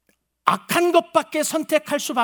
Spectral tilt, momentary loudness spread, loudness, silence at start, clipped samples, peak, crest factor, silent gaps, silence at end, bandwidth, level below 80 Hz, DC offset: -3 dB/octave; 5 LU; -21 LUFS; 0.45 s; under 0.1%; 0 dBFS; 22 dB; none; 0 s; over 20 kHz; -72 dBFS; under 0.1%